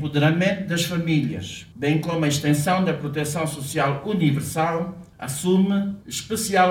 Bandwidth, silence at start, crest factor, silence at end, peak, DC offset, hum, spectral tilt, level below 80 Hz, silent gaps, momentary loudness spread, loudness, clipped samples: 17.5 kHz; 0 s; 16 dB; 0 s; -6 dBFS; under 0.1%; none; -5.5 dB/octave; -54 dBFS; none; 9 LU; -23 LUFS; under 0.1%